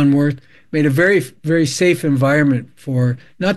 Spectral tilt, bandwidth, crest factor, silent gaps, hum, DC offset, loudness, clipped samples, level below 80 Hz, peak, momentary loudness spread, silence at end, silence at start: -6.5 dB/octave; 12.5 kHz; 14 dB; none; none; under 0.1%; -16 LUFS; under 0.1%; -52 dBFS; -2 dBFS; 8 LU; 0 s; 0 s